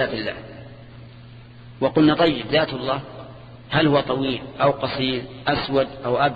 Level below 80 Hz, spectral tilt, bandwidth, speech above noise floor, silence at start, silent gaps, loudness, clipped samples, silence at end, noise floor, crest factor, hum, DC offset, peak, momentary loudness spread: -48 dBFS; -8.5 dB/octave; 5 kHz; 21 dB; 0 s; none; -21 LUFS; under 0.1%; 0 s; -42 dBFS; 18 dB; none; under 0.1%; -4 dBFS; 23 LU